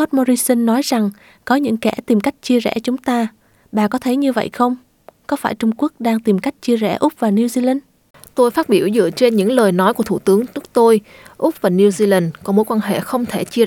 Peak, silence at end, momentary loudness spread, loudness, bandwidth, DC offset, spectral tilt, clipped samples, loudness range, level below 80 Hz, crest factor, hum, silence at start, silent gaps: -2 dBFS; 0 s; 7 LU; -17 LUFS; 18.5 kHz; under 0.1%; -5.5 dB/octave; under 0.1%; 4 LU; -58 dBFS; 14 dB; none; 0 s; 8.10-8.14 s